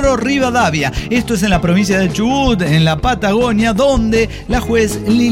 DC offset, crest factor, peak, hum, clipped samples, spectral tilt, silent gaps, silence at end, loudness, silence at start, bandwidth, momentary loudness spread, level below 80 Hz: under 0.1%; 12 dB; -2 dBFS; none; under 0.1%; -5.5 dB/octave; none; 0 s; -14 LUFS; 0 s; 16 kHz; 4 LU; -26 dBFS